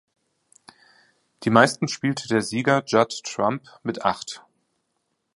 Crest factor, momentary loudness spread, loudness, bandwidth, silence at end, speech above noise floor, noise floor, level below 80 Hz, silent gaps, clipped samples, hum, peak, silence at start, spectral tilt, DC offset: 24 dB; 14 LU; -22 LUFS; 11.5 kHz; 0.95 s; 53 dB; -75 dBFS; -66 dBFS; none; under 0.1%; none; 0 dBFS; 1.4 s; -4.5 dB/octave; under 0.1%